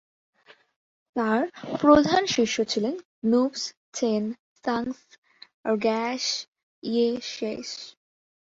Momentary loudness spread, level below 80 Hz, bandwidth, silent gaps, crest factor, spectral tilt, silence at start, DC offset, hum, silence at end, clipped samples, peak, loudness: 15 LU; -60 dBFS; 8 kHz; 3.05-3.22 s, 3.77-3.92 s, 4.39-4.56 s, 5.18-5.22 s, 5.54-5.64 s, 6.48-6.52 s, 6.63-6.82 s; 22 dB; -4 dB/octave; 1.15 s; under 0.1%; none; 0.65 s; under 0.1%; -6 dBFS; -25 LUFS